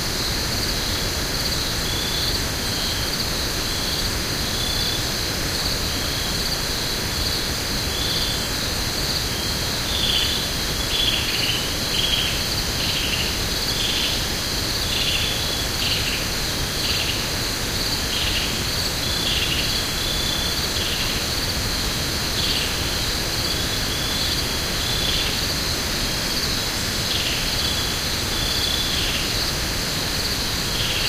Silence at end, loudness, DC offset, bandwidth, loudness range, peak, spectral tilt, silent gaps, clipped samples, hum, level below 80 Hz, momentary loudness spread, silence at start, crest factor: 0 s; -21 LUFS; under 0.1%; 16 kHz; 2 LU; -8 dBFS; -2 dB/octave; none; under 0.1%; none; -32 dBFS; 3 LU; 0 s; 16 dB